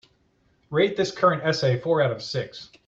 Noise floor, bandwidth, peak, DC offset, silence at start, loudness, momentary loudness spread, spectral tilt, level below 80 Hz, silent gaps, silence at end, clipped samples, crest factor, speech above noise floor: -65 dBFS; 8 kHz; -6 dBFS; under 0.1%; 0.7 s; -23 LUFS; 9 LU; -5.5 dB/octave; -62 dBFS; none; 0.2 s; under 0.1%; 18 dB; 41 dB